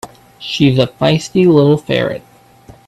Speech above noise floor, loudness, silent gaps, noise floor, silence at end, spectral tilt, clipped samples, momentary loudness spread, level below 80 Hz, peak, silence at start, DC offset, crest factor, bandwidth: 30 dB; -13 LUFS; none; -42 dBFS; 0.7 s; -6.5 dB/octave; under 0.1%; 13 LU; -48 dBFS; 0 dBFS; 0.05 s; under 0.1%; 14 dB; 12.5 kHz